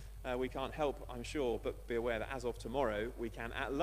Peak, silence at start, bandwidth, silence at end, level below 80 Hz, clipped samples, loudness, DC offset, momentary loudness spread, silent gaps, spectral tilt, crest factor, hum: -20 dBFS; 0 s; 15 kHz; 0 s; -50 dBFS; under 0.1%; -39 LUFS; under 0.1%; 5 LU; none; -5.5 dB/octave; 18 dB; none